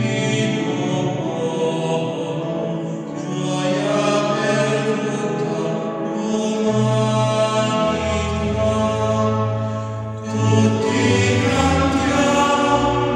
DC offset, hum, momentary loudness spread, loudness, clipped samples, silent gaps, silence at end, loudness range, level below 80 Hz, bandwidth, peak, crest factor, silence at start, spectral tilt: under 0.1%; none; 8 LU; -19 LUFS; under 0.1%; none; 0 s; 4 LU; -44 dBFS; 10.5 kHz; -2 dBFS; 16 dB; 0 s; -5.5 dB/octave